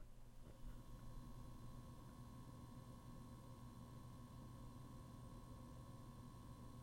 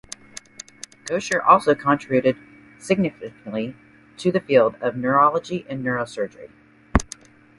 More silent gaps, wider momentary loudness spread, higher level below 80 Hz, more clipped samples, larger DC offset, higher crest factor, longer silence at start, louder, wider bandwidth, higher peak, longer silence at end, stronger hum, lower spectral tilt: neither; second, 1 LU vs 22 LU; second, -62 dBFS vs -40 dBFS; neither; neither; second, 14 dB vs 22 dB; second, 0 s vs 1.05 s; second, -60 LUFS vs -21 LUFS; first, 16 kHz vs 11.5 kHz; second, -44 dBFS vs 0 dBFS; second, 0 s vs 0.55 s; neither; about the same, -6.5 dB/octave vs -5.5 dB/octave